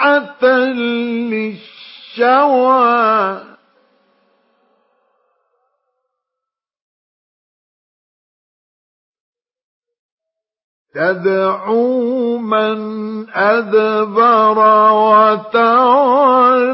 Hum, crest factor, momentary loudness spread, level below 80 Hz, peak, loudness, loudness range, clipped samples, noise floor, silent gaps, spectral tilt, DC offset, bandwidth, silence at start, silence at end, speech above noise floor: none; 14 dB; 12 LU; -76 dBFS; 0 dBFS; -13 LUFS; 11 LU; under 0.1%; -83 dBFS; 6.82-9.13 s, 9.20-9.33 s, 9.64-9.82 s, 9.99-10.18 s, 10.64-10.85 s; -10 dB/octave; under 0.1%; 5.8 kHz; 0 s; 0 s; 70 dB